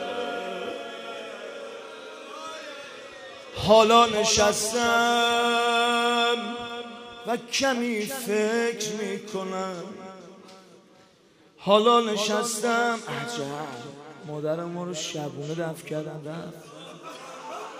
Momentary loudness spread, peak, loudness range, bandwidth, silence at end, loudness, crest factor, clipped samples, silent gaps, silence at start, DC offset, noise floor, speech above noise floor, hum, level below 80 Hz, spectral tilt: 20 LU; -6 dBFS; 12 LU; 15.5 kHz; 0 s; -24 LUFS; 22 dB; under 0.1%; none; 0 s; under 0.1%; -57 dBFS; 33 dB; none; -62 dBFS; -3 dB/octave